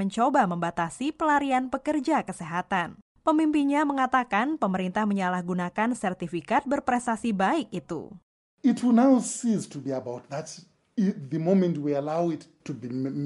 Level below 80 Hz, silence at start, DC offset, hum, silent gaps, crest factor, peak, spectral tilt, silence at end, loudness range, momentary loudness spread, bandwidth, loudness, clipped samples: -64 dBFS; 0 s; under 0.1%; none; 3.02-3.15 s, 8.23-8.58 s; 16 dB; -10 dBFS; -6 dB/octave; 0 s; 3 LU; 12 LU; 11.5 kHz; -26 LUFS; under 0.1%